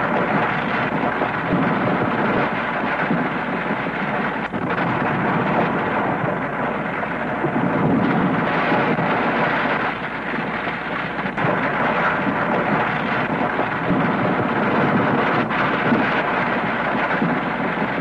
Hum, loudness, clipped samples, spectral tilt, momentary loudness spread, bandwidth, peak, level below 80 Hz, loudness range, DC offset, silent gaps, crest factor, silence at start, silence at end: none; -20 LUFS; under 0.1%; -8 dB/octave; 5 LU; 10 kHz; -6 dBFS; -48 dBFS; 2 LU; under 0.1%; none; 14 dB; 0 s; 0 s